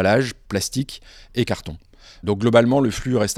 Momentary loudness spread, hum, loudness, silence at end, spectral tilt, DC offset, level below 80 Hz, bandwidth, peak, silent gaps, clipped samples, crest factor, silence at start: 17 LU; none; -21 LUFS; 0 s; -5.5 dB/octave; under 0.1%; -44 dBFS; 16 kHz; -2 dBFS; none; under 0.1%; 20 dB; 0 s